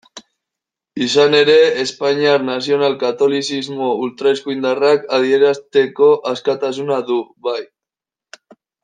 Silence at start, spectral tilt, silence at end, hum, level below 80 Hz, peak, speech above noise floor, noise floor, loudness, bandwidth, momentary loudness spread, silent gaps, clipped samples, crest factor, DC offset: 0.15 s; -4 dB/octave; 1.2 s; none; -66 dBFS; 0 dBFS; 72 dB; -87 dBFS; -16 LUFS; 9.4 kHz; 10 LU; none; under 0.1%; 16 dB; under 0.1%